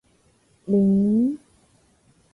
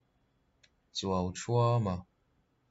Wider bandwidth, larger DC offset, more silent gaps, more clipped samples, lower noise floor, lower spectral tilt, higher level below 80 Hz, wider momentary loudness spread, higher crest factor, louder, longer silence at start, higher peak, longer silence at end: second, 1.2 kHz vs 8 kHz; neither; neither; neither; second, -61 dBFS vs -73 dBFS; first, -11.5 dB/octave vs -6 dB/octave; first, -58 dBFS vs -64 dBFS; first, 18 LU vs 12 LU; about the same, 14 dB vs 16 dB; first, -21 LUFS vs -32 LUFS; second, 0.65 s vs 0.95 s; first, -10 dBFS vs -18 dBFS; first, 0.95 s vs 0.7 s